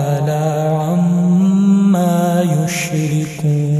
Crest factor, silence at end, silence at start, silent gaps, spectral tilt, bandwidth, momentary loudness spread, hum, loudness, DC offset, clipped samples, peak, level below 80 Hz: 10 dB; 0 s; 0 s; none; -7 dB/octave; 14.5 kHz; 6 LU; none; -15 LUFS; under 0.1%; under 0.1%; -4 dBFS; -52 dBFS